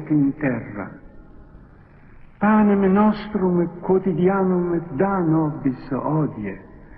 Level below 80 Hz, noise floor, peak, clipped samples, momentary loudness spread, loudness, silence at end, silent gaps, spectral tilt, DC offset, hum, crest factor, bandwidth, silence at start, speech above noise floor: -46 dBFS; -46 dBFS; -6 dBFS; under 0.1%; 14 LU; -20 LUFS; 0.05 s; none; -12.5 dB/octave; under 0.1%; none; 14 dB; 4.7 kHz; 0 s; 27 dB